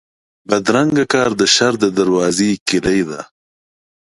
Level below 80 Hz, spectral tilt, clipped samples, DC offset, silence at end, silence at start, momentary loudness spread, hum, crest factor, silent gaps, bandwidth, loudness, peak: -50 dBFS; -3.5 dB/octave; under 0.1%; under 0.1%; 0.9 s; 0.5 s; 7 LU; none; 16 dB; 2.61-2.66 s; 11.5 kHz; -15 LUFS; 0 dBFS